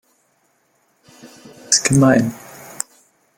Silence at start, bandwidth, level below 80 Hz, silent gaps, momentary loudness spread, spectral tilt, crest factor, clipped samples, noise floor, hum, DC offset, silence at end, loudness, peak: 1.7 s; 17 kHz; -52 dBFS; none; 21 LU; -4 dB/octave; 20 dB; under 0.1%; -63 dBFS; none; under 0.1%; 1 s; -16 LUFS; 0 dBFS